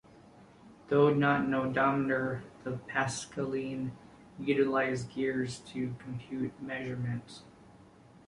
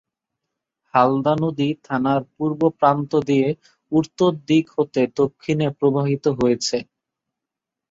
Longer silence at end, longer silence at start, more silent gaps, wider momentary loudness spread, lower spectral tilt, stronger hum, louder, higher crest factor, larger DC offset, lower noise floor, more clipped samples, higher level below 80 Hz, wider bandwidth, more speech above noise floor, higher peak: second, 0.55 s vs 1.1 s; second, 0.35 s vs 0.95 s; neither; first, 13 LU vs 5 LU; about the same, -6 dB/octave vs -6.5 dB/octave; neither; second, -32 LUFS vs -20 LUFS; about the same, 18 dB vs 20 dB; neither; second, -57 dBFS vs -85 dBFS; neither; second, -64 dBFS vs -58 dBFS; first, 11.5 kHz vs 8 kHz; second, 26 dB vs 66 dB; second, -14 dBFS vs -2 dBFS